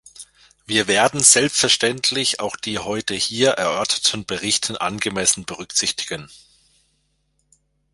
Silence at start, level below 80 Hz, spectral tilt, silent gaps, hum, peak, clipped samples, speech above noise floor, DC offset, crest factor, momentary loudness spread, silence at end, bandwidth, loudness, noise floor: 0.2 s; -56 dBFS; -1.5 dB/octave; none; none; 0 dBFS; under 0.1%; 47 dB; under 0.1%; 22 dB; 12 LU; 1.55 s; 16 kHz; -18 LUFS; -67 dBFS